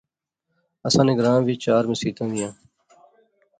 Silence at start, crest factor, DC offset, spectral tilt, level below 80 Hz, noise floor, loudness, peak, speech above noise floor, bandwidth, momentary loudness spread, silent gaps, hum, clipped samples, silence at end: 0.85 s; 20 dB; under 0.1%; -5.5 dB/octave; -58 dBFS; -79 dBFS; -21 LUFS; -4 dBFS; 59 dB; 9.4 kHz; 12 LU; none; none; under 0.1%; 1.05 s